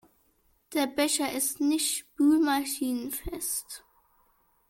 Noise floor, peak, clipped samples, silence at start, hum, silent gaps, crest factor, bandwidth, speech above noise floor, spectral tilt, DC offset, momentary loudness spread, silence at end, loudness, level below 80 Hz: -68 dBFS; -12 dBFS; under 0.1%; 0.7 s; none; none; 18 dB; 17 kHz; 41 dB; -2 dB/octave; under 0.1%; 10 LU; 0.9 s; -28 LUFS; -56 dBFS